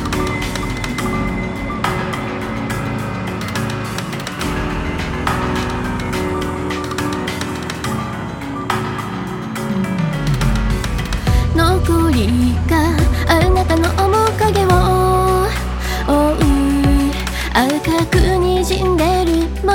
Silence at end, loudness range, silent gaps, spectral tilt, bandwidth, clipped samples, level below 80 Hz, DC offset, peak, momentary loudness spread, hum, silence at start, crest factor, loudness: 0 s; 7 LU; none; -6 dB/octave; 18.5 kHz; under 0.1%; -24 dBFS; 0.1%; 0 dBFS; 9 LU; none; 0 s; 16 dB; -17 LUFS